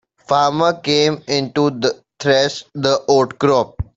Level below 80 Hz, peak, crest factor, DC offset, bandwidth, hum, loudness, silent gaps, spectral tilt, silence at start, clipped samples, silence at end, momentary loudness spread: -44 dBFS; 0 dBFS; 16 dB; under 0.1%; 7.8 kHz; none; -17 LUFS; none; -4.5 dB/octave; 0.3 s; under 0.1%; 0.15 s; 6 LU